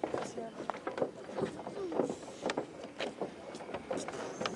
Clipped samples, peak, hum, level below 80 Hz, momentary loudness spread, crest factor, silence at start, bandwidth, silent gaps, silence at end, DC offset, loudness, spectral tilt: under 0.1%; -16 dBFS; none; -72 dBFS; 7 LU; 24 dB; 0 s; 11.5 kHz; none; 0 s; under 0.1%; -40 LUFS; -4.5 dB/octave